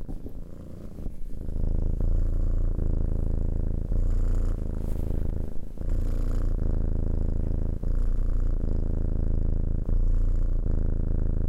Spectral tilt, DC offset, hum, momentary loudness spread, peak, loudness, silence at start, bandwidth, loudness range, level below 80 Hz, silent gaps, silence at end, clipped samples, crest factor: -10 dB/octave; under 0.1%; none; 11 LU; -14 dBFS; -31 LUFS; 0 s; 1.8 kHz; 2 LU; -26 dBFS; none; 0 s; under 0.1%; 10 dB